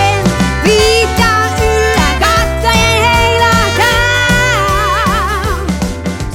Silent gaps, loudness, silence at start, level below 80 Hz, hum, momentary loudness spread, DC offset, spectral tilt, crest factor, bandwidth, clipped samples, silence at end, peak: none; -10 LUFS; 0 s; -20 dBFS; none; 7 LU; under 0.1%; -4 dB/octave; 10 dB; 18.5 kHz; under 0.1%; 0 s; 0 dBFS